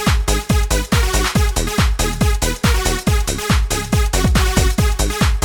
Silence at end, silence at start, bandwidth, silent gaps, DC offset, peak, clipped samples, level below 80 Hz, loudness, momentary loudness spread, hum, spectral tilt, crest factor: 0 s; 0 s; 19 kHz; none; under 0.1%; -2 dBFS; under 0.1%; -18 dBFS; -17 LUFS; 2 LU; none; -4 dB/octave; 14 dB